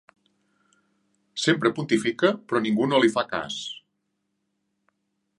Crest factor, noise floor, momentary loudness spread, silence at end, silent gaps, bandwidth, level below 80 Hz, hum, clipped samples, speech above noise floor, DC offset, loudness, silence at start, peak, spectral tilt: 20 dB; -77 dBFS; 13 LU; 1.6 s; none; 11.5 kHz; -68 dBFS; none; under 0.1%; 54 dB; under 0.1%; -24 LUFS; 1.35 s; -6 dBFS; -4.5 dB/octave